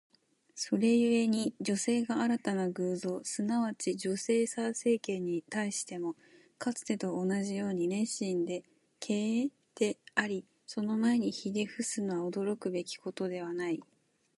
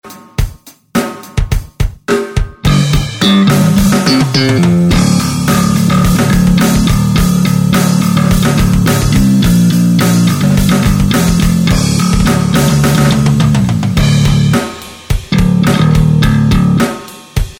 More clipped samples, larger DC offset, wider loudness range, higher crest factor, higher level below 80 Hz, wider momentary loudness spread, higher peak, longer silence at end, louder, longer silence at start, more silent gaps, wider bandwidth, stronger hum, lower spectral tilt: neither; neither; about the same, 4 LU vs 2 LU; first, 18 dB vs 10 dB; second, -80 dBFS vs -20 dBFS; about the same, 9 LU vs 9 LU; second, -14 dBFS vs 0 dBFS; first, 0.55 s vs 0.05 s; second, -33 LUFS vs -10 LUFS; first, 0.55 s vs 0.05 s; neither; second, 11.5 kHz vs 17 kHz; neither; about the same, -4.5 dB/octave vs -5.5 dB/octave